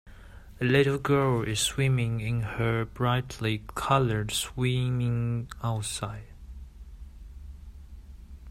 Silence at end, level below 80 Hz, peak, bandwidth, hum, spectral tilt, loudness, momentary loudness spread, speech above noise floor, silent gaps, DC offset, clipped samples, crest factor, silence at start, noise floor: 0 s; -46 dBFS; -8 dBFS; 16 kHz; none; -5 dB/octave; -28 LUFS; 23 LU; 20 dB; none; under 0.1%; under 0.1%; 20 dB; 0.05 s; -47 dBFS